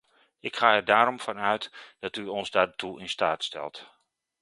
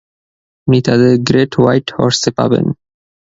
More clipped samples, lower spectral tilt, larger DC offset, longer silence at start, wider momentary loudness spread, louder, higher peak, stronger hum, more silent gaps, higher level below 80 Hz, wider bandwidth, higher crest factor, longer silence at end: neither; second, -3.5 dB/octave vs -6 dB/octave; neither; second, 0.45 s vs 0.65 s; first, 16 LU vs 8 LU; second, -26 LUFS vs -13 LUFS; second, -4 dBFS vs 0 dBFS; neither; neither; second, -68 dBFS vs -48 dBFS; first, 11.5 kHz vs 8 kHz; first, 24 dB vs 14 dB; about the same, 0.55 s vs 0.5 s